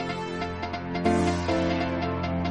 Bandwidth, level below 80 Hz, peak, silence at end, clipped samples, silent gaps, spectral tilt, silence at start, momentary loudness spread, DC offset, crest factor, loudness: 11 kHz; -44 dBFS; -10 dBFS; 0 s; under 0.1%; none; -6.5 dB/octave; 0 s; 7 LU; under 0.1%; 16 dB; -27 LUFS